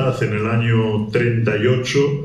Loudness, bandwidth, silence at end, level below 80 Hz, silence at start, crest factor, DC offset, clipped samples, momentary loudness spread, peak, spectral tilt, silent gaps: -18 LUFS; 10 kHz; 0 s; -48 dBFS; 0 s; 12 dB; under 0.1%; under 0.1%; 2 LU; -4 dBFS; -6.5 dB/octave; none